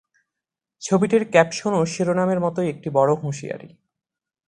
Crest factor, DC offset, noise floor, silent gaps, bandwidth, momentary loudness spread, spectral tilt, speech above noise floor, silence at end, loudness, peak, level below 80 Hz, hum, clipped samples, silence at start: 22 dB; under 0.1%; -86 dBFS; none; 10.5 kHz; 14 LU; -6 dB/octave; 66 dB; 0.85 s; -21 LUFS; 0 dBFS; -60 dBFS; none; under 0.1%; 0.8 s